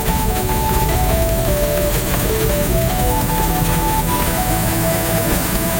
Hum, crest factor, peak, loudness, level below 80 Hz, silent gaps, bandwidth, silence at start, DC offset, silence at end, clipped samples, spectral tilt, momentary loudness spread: none; 14 dB; -2 dBFS; -17 LUFS; -22 dBFS; none; 17 kHz; 0 s; 0.2%; 0 s; under 0.1%; -4.5 dB/octave; 1 LU